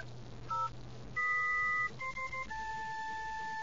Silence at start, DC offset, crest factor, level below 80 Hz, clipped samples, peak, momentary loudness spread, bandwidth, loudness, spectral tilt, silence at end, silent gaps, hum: 0 s; 0.4%; 12 dB; -58 dBFS; under 0.1%; -26 dBFS; 10 LU; 7.8 kHz; -36 LUFS; -3.5 dB/octave; 0 s; none; none